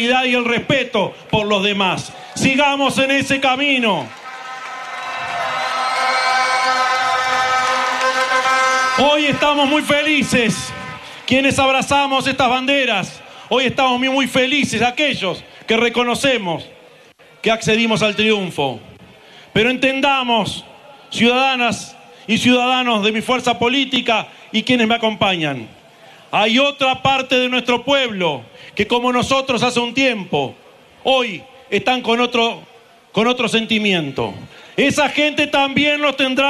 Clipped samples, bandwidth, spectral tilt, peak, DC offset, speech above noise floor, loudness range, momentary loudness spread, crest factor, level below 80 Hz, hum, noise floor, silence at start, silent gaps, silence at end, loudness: under 0.1%; 13 kHz; -3.5 dB/octave; -2 dBFS; under 0.1%; 30 dB; 3 LU; 10 LU; 16 dB; -52 dBFS; none; -46 dBFS; 0 s; none; 0 s; -16 LUFS